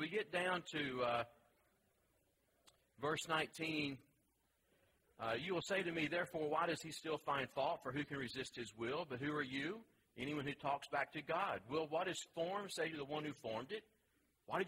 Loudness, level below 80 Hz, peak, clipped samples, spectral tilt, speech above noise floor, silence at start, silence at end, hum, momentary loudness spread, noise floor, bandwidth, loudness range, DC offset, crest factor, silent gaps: -43 LUFS; -76 dBFS; -24 dBFS; under 0.1%; -4.5 dB/octave; 38 dB; 0 s; 0 s; none; 7 LU; -81 dBFS; 16 kHz; 3 LU; under 0.1%; 20 dB; none